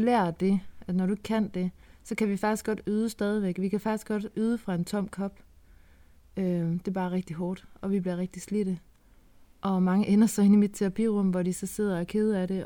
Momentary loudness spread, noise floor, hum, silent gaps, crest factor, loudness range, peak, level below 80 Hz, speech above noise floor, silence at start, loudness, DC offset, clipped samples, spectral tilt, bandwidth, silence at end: 11 LU; -57 dBFS; none; none; 16 dB; 7 LU; -12 dBFS; -56 dBFS; 30 dB; 0 s; -28 LUFS; under 0.1%; under 0.1%; -7 dB/octave; 18.5 kHz; 0 s